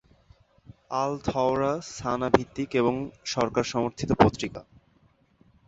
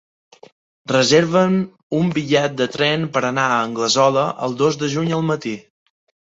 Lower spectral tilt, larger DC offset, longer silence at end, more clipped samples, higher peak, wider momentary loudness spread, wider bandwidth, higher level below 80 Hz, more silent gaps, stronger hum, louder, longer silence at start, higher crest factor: about the same, -5.5 dB/octave vs -4.5 dB/octave; neither; first, 1.05 s vs 0.75 s; neither; about the same, -2 dBFS vs -2 dBFS; first, 11 LU vs 8 LU; about the same, 8 kHz vs 8 kHz; first, -50 dBFS vs -60 dBFS; second, none vs 1.83-1.90 s; neither; second, -26 LUFS vs -18 LUFS; about the same, 0.9 s vs 0.9 s; first, 26 dB vs 18 dB